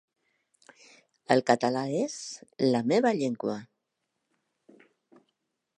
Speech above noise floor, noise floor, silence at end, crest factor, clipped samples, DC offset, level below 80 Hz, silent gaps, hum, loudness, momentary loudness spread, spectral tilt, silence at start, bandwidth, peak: 55 dB; -82 dBFS; 2.15 s; 26 dB; under 0.1%; under 0.1%; -78 dBFS; none; none; -27 LUFS; 13 LU; -5 dB/octave; 1.3 s; 10 kHz; -6 dBFS